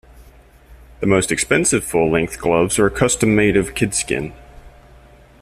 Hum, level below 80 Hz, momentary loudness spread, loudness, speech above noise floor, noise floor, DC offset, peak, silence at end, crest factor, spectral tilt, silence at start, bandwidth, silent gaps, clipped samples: none; -40 dBFS; 7 LU; -17 LUFS; 29 dB; -46 dBFS; under 0.1%; -2 dBFS; 0.75 s; 16 dB; -4.5 dB/octave; 0.15 s; 15.5 kHz; none; under 0.1%